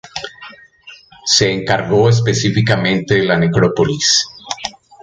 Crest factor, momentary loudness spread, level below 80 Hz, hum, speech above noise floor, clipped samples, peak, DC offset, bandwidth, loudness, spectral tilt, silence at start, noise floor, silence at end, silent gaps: 16 dB; 13 LU; -44 dBFS; none; 28 dB; under 0.1%; 0 dBFS; under 0.1%; 9.4 kHz; -14 LUFS; -4 dB/octave; 0.05 s; -41 dBFS; 0.35 s; none